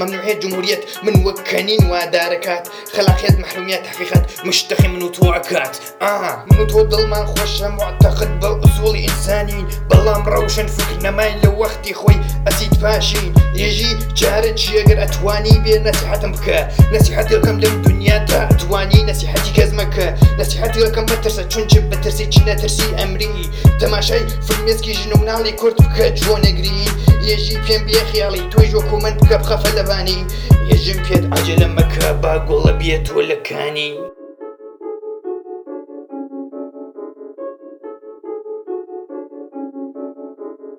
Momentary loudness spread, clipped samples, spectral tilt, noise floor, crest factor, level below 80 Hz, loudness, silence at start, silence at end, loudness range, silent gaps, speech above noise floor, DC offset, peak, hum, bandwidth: 18 LU; 0.2%; -5 dB/octave; -34 dBFS; 14 dB; -20 dBFS; -15 LUFS; 0 s; 0.05 s; 16 LU; none; 21 dB; under 0.1%; 0 dBFS; none; 19.5 kHz